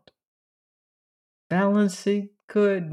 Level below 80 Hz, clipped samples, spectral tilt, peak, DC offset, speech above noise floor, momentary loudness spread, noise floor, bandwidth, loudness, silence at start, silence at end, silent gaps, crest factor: -78 dBFS; under 0.1%; -6.5 dB/octave; -12 dBFS; under 0.1%; over 68 dB; 7 LU; under -90 dBFS; 12 kHz; -24 LUFS; 1.5 s; 0 s; 2.44-2.48 s; 14 dB